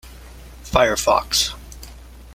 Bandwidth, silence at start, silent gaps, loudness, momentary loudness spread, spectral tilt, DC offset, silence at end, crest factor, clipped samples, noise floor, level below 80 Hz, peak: 16.5 kHz; 0.05 s; none; -18 LUFS; 23 LU; -2 dB/octave; under 0.1%; 0 s; 20 dB; under 0.1%; -40 dBFS; -38 dBFS; -2 dBFS